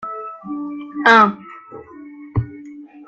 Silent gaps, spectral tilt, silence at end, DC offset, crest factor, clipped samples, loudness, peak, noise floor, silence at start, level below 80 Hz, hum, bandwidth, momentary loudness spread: none; -6 dB/octave; 0.05 s; under 0.1%; 20 dB; under 0.1%; -16 LUFS; 0 dBFS; -38 dBFS; 0 s; -50 dBFS; none; 9.4 kHz; 27 LU